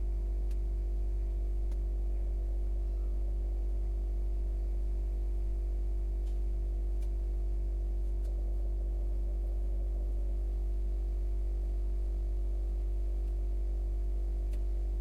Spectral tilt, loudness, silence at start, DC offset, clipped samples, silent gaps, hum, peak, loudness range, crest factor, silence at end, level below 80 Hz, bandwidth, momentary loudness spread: -9 dB/octave; -37 LUFS; 0 s; under 0.1%; under 0.1%; none; none; -26 dBFS; 0 LU; 6 dB; 0 s; -32 dBFS; 1.3 kHz; 0 LU